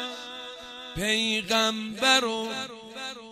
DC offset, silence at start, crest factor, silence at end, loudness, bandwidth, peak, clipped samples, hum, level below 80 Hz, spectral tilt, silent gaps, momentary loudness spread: under 0.1%; 0 s; 22 dB; 0 s; -25 LUFS; 15.5 kHz; -6 dBFS; under 0.1%; none; -56 dBFS; -2 dB/octave; none; 17 LU